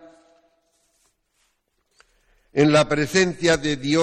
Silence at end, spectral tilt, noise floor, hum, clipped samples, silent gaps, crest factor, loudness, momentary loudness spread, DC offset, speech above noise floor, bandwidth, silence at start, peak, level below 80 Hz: 0 s; -4.5 dB/octave; -70 dBFS; none; under 0.1%; none; 20 dB; -19 LUFS; 5 LU; under 0.1%; 51 dB; 14 kHz; 2.55 s; -4 dBFS; -50 dBFS